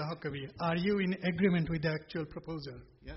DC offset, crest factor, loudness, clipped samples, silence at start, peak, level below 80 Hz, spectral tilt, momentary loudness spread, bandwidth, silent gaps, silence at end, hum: under 0.1%; 16 dB; -34 LUFS; under 0.1%; 0 s; -18 dBFS; -56 dBFS; -6 dB/octave; 13 LU; 5.8 kHz; none; 0 s; none